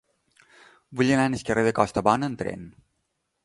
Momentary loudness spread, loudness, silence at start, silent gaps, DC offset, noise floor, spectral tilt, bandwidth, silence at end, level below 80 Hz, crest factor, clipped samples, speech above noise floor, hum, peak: 12 LU; -24 LUFS; 0.9 s; none; under 0.1%; -76 dBFS; -6 dB/octave; 11.5 kHz; 0.75 s; -54 dBFS; 24 dB; under 0.1%; 53 dB; none; -2 dBFS